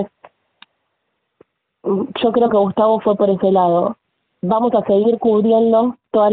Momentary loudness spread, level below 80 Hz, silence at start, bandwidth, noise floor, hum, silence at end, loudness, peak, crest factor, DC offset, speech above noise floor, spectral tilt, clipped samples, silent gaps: 9 LU; -60 dBFS; 0 s; 4.5 kHz; -72 dBFS; none; 0 s; -16 LUFS; -4 dBFS; 14 dB; under 0.1%; 57 dB; -6.5 dB/octave; under 0.1%; none